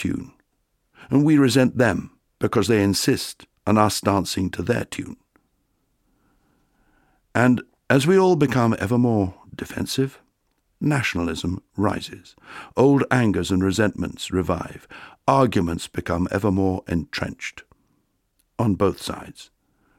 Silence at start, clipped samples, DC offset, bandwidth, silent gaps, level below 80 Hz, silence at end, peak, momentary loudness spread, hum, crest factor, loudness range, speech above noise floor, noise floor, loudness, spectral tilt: 0 s; under 0.1%; under 0.1%; 16.5 kHz; none; -48 dBFS; 0.55 s; -2 dBFS; 15 LU; none; 20 dB; 6 LU; 50 dB; -71 dBFS; -21 LUFS; -6 dB/octave